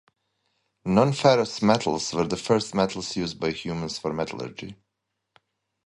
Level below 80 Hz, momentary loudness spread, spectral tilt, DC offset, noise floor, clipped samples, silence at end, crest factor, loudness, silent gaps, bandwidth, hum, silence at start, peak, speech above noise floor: -56 dBFS; 14 LU; -5 dB/octave; under 0.1%; -81 dBFS; under 0.1%; 1.1 s; 22 dB; -24 LUFS; none; 11.5 kHz; none; 0.85 s; -4 dBFS; 57 dB